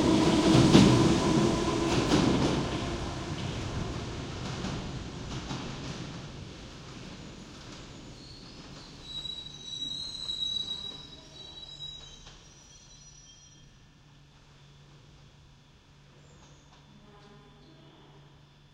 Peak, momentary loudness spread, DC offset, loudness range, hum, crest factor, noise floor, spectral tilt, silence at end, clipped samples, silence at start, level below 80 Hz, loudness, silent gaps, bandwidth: -6 dBFS; 23 LU; under 0.1%; 22 LU; none; 26 dB; -57 dBFS; -5.5 dB/octave; 1.35 s; under 0.1%; 0 s; -48 dBFS; -28 LUFS; none; 15.5 kHz